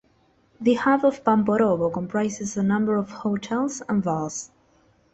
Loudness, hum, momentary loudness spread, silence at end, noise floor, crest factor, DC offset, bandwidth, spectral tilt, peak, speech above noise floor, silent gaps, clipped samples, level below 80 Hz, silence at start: -23 LUFS; none; 8 LU; 0.65 s; -62 dBFS; 18 dB; under 0.1%; 8.2 kHz; -6 dB/octave; -6 dBFS; 39 dB; none; under 0.1%; -60 dBFS; 0.6 s